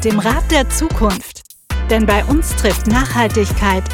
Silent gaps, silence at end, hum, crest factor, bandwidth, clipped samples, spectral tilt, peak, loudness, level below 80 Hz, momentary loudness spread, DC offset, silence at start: none; 0 s; none; 12 dB; 17 kHz; under 0.1%; -5 dB/octave; -2 dBFS; -15 LUFS; -20 dBFS; 7 LU; under 0.1%; 0 s